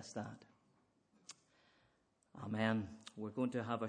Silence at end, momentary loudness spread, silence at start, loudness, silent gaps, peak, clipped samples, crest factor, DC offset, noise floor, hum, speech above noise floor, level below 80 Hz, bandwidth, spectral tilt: 0 s; 23 LU; 0 s; -42 LUFS; none; -20 dBFS; under 0.1%; 24 dB; under 0.1%; -77 dBFS; none; 37 dB; -80 dBFS; 9.6 kHz; -6 dB/octave